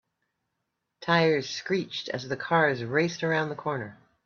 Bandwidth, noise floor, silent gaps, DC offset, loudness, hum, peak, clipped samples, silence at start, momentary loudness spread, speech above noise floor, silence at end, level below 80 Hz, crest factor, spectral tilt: 7.2 kHz; -81 dBFS; none; under 0.1%; -27 LUFS; none; -8 dBFS; under 0.1%; 1 s; 10 LU; 54 dB; 0.3 s; -70 dBFS; 20 dB; -5 dB/octave